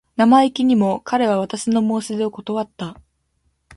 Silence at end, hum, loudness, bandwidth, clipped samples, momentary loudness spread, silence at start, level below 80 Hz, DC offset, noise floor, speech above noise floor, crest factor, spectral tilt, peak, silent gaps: 0.85 s; none; -18 LUFS; 11.5 kHz; under 0.1%; 12 LU; 0.2 s; -58 dBFS; under 0.1%; -67 dBFS; 49 dB; 16 dB; -5.5 dB/octave; -2 dBFS; none